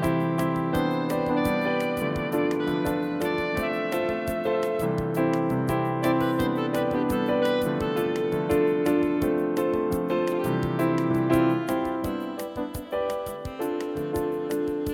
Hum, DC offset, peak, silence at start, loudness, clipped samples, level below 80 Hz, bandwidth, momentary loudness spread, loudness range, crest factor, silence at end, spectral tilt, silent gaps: none; under 0.1%; -10 dBFS; 0 s; -26 LUFS; under 0.1%; -48 dBFS; 17 kHz; 6 LU; 2 LU; 16 dB; 0 s; -7 dB/octave; none